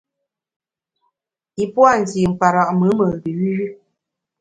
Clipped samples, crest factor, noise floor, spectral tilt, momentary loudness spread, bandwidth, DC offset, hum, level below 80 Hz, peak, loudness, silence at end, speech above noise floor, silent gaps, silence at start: under 0.1%; 18 dB; -80 dBFS; -7 dB/octave; 11 LU; 9.2 kHz; under 0.1%; none; -52 dBFS; 0 dBFS; -17 LUFS; 0.65 s; 64 dB; none; 1.6 s